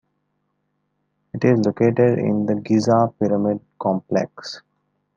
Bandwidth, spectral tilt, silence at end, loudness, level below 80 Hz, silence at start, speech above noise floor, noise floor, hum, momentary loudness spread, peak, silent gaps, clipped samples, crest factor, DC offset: 7.6 kHz; -7.5 dB/octave; 0.6 s; -20 LUFS; -66 dBFS; 1.35 s; 53 dB; -72 dBFS; none; 15 LU; -4 dBFS; none; under 0.1%; 18 dB; under 0.1%